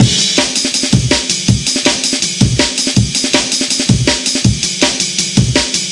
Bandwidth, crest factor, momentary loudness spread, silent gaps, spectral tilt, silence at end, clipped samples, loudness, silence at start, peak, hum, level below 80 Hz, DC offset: 11.5 kHz; 12 dB; 1 LU; none; -3 dB/octave; 0 s; 0.1%; -12 LUFS; 0 s; 0 dBFS; none; -30 dBFS; 0.1%